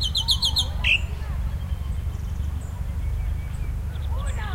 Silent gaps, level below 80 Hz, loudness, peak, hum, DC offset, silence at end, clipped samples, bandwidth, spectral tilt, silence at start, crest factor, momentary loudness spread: none; -28 dBFS; -26 LUFS; -8 dBFS; none; under 0.1%; 0 s; under 0.1%; 16 kHz; -3 dB/octave; 0 s; 16 dB; 11 LU